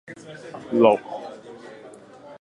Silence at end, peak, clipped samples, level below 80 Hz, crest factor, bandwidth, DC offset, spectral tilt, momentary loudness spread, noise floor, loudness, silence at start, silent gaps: 0.1 s; -2 dBFS; under 0.1%; -70 dBFS; 22 dB; 11 kHz; under 0.1%; -6.5 dB/octave; 25 LU; -45 dBFS; -20 LUFS; 0.1 s; none